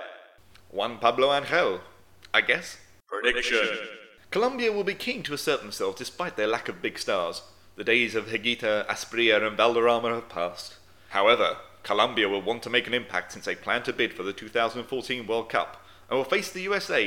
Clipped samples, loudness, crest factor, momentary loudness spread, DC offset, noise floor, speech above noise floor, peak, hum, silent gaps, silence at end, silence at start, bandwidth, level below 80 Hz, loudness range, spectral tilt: under 0.1%; -26 LUFS; 22 dB; 11 LU; 0.2%; -54 dBFS; 28 dB; -4 dBFS; none; none; 0 s; 0 s; 17 kHz; -62 dBFS; 4 LU; -3 dB/octave